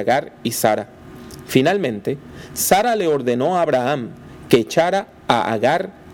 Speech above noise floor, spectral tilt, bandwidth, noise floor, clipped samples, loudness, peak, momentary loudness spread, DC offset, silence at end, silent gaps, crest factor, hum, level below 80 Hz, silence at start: 19 dB; -4.5 dB/octave; 18 kHz; -37 dBFS; under 0.1%; -19 LUFS; 0 dBFS; 16 LU; under 0.1%; 0 s; none; 20 dB; none; -52 dBFS; 0 s